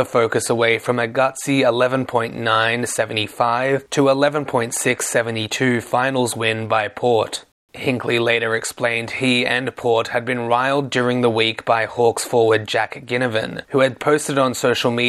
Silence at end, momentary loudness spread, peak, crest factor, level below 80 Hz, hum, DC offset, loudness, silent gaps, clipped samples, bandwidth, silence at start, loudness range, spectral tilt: 0 s; 5 LU; -2 dBFS; 16 dB; -62 dBFS; none; under 0.1%; -19 LUFS; 7.52-7.68 s; under 0.1%; 14 kHz; 0 s; 1 LU; -4 dB/octave